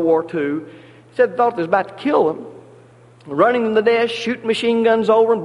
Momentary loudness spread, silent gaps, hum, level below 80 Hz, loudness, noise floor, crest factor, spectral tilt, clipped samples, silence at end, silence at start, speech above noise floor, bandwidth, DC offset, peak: 12 LU; none; none; -64 dBFS; -18 LUFS; -46 dBFS; 16 dB; -5.5 dB/octave; under 0.1%; 0 s; 0 s; 29 dB; 11 kHz; under 0.1%; -2 dBFS